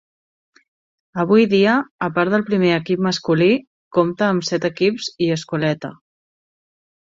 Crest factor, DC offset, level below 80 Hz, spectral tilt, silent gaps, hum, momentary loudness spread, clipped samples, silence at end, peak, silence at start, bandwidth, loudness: 16 dB; under 0.1%; -60 dBFS; -6 dB/octave; 1.91-1.99 s, 3.67-3.91 s; none; 8 LU; under 0.1%; 1.25 s; -2 dBFS; 1.15 s; 7.8 kHz; -18 LUFS